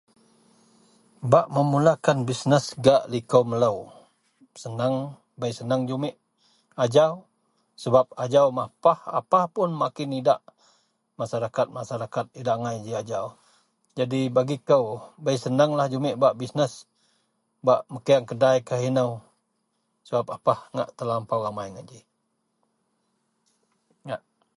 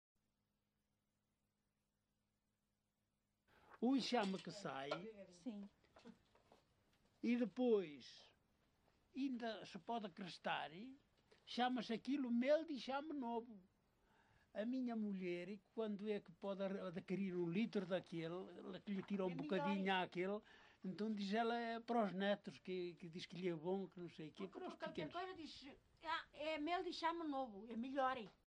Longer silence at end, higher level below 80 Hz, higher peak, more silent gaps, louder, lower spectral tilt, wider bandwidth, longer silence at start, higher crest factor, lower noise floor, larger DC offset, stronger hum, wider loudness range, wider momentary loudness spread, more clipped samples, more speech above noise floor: first, 0.4 s vs 0.2 s; first, -66 dBFS vs -84 dBFS; first, -2 dBFS vs -26 dBFS; neither; first, -24 LUFS vs -45 LUFS; about the same, -6.5 dB/octave vs -6 dB/octave; first, 11.5 kHz vs 10 kHz; second, 1.2 s vs 3.7 s; about the same, 22 dB vs 20 dB; second, -75 dBFS vs -89 dBFS; neither; neither; first, 8 LU vs 5 LU; about the same, 15 LU vs 14 LU; neither; first, 51 dB vs 44 dB